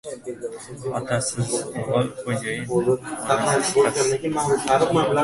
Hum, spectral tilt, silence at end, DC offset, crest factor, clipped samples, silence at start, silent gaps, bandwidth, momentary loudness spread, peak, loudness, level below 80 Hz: none; -4.5 dB/octave; 0 s; under 0.1%; 18 dB; under 0.1%; 0.05 s; none; 11.5 kHz; 13 LU; -4 dBFS; -22 LUFS; -54 dBFS